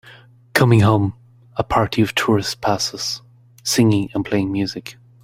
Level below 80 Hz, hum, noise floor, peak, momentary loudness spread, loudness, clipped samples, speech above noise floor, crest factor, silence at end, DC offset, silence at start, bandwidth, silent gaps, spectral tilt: -46 dBFS; none; -46 dBFS; 0 dBFS; 13 LU; -19 LUFS; under 0.1%; 28 dB; 18 dB; 0.3 s; under 0.1%; 0.05 s; 16 kHz; none; -5 dB/octave